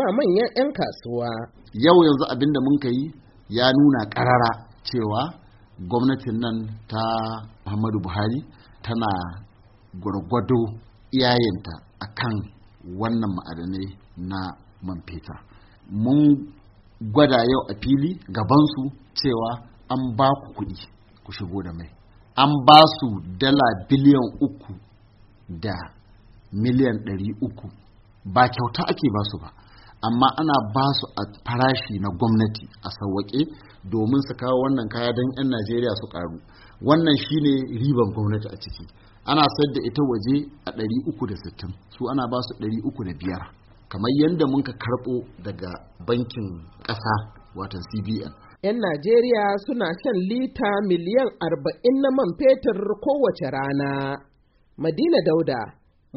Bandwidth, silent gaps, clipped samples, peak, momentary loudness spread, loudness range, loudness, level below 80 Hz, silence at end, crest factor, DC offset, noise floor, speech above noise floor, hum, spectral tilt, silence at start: 6 kHz; none; under 0.1%; 0 dBFS; 17 LU; 9 LU; -22 LUFS; -50 dBFS; 0.45 s; 22 dB; under 0.1%; -59 dBFS; 37 dB; none; -5 dB/octave; 0 s